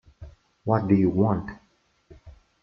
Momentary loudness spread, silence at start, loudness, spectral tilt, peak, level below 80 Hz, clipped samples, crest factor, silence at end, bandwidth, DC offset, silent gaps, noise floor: 15 LU; 0.2 s; -24 LUFS; -11 dB/octave; -6 dBFS; -52 dBFS; under 0.1%; 20 dB; 0.3 s; 5.8 kHz; under 0.1%; none; -65 dBFS